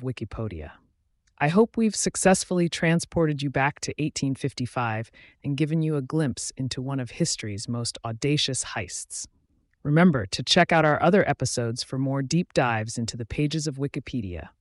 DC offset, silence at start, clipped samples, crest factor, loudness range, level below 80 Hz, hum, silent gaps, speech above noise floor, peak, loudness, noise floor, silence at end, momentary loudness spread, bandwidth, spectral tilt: under 0.1%; 0 s; under 0.1%; 18 dB; 6 LU; -52 dBFS; none; none; 44 dB; -8 dBFS; -25 LUFS; -69 dBFS; 0.1 s; 13 LU; 11.5 kHz; -4.5 dB/octave